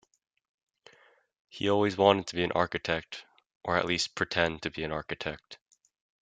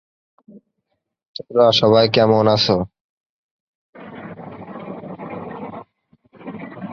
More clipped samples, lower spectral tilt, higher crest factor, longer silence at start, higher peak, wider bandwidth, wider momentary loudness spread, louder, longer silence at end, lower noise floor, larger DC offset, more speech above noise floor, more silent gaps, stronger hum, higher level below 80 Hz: neither; second, -4.5 dB/octave vs -6 dB/octave; first, 26 dB vs 18 dB; first, 1.55 s vs 0.55 s; second, -6 dBFS vs -2 dBFS; first, 9.4 kHz vs 7.4 kHz; second, 17 LU vs 23 LU; second, -29 LUFS vs -15 LUFS; first, 0.7 s vs 0 s; second, -63 dBFS vs -74 dBFS; neither; second, 33 dB vs 60 dB; second, 3.55-3.61 s vs 1.26-1.34 s, 3.01-3.93 s; neither; second, -60 dBFS vs -54 dBFS